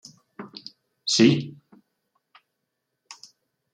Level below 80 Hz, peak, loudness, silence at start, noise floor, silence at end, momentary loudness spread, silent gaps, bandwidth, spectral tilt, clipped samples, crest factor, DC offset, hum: -70 dBFS; -6 dBFS; -21 LUFS; 0.4 s; -80 dBFS; 2.25 s; 27 LU; none; 10.5 kHz; -4.5 dB/octave; under 0.1%; 22 dB; under 0.1%; none